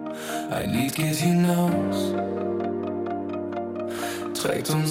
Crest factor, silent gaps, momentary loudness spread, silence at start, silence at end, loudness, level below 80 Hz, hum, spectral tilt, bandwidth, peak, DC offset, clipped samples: 16 dB; none; 9 LU; 0 s; 0 s; -26 LUFS; -58 dBFS; none; -5.5 dB/octave; 16.5 kHz; -10 dBFS; under 0.1%; under 0.1%